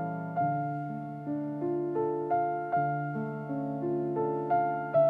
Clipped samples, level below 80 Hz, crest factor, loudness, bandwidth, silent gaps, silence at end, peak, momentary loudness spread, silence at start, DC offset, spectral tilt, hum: under 0.1%; -72 dBFS; 16 dB; -32 LUFS; 4.3 kHz; none; 0 s; -16 dBFS; 7 LU; 0 s; under 0.1%; -11 dB/octave; none